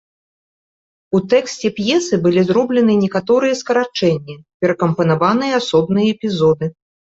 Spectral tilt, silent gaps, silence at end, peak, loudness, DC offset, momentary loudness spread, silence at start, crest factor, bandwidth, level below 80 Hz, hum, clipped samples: -6 dB/octave; 4.54-4.60 s; 0.3 s; -2 dBFS; -16 LUFS; under 0.1%; 6 LU; 1.1 s; 14 dB; 8 kHz; -54 dBFS; none; under 0.1%